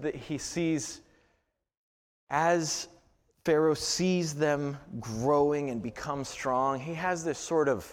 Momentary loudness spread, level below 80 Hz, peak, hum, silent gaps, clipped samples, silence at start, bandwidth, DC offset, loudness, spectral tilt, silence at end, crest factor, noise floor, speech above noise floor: 10 LU; -60 dBFS; -14 dBFS; none; 1.77-2.27 s; under 0.1%; 0 s; 16.5 kHz; under 0.1%; -30 LUFS; -4.5 dB/octave; 0 s; 18 dB; -75 dBFS; 46 dB